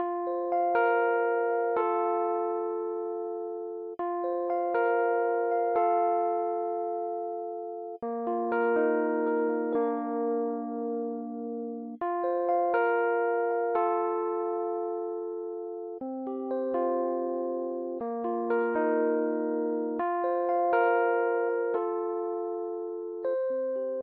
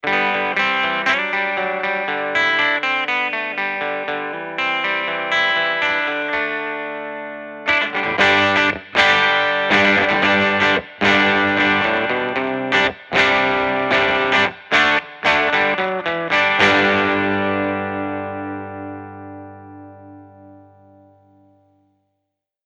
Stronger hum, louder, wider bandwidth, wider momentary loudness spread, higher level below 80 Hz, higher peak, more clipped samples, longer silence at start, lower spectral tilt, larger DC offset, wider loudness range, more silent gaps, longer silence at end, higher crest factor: second, none vs 50 Hz at -50 dBFS; second, -29 LUFS vs -17 LUFS; second, 4.1 kHz vs 10 kHz; about the same, 10 LU vs 12 LU; second, -80 dBFS vs -54 dBFS; second, -14 dBFS vs 0 dBFS; neither; about the same, 0 s vs 0.05 s; about the same, -4.5 dB/octave vs -4 dB/octave; neither; second, 4 LU vs 7 LU; neither; second, 0 s vs 2.1 s; about the same, 14 dB vs 18 dB